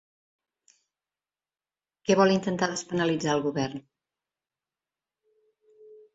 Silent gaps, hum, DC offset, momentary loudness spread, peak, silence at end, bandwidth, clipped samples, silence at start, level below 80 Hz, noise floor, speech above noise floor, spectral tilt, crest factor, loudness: none; none; under 0.1%; 12 LU; -8 dBFS; 0.2 s; 8 kHz; under 0.1%; 2.1 s; -66 dBFS; under -90 dBFS; over 65 dB; -5 dB/octave; 22 dB; -26 LUFS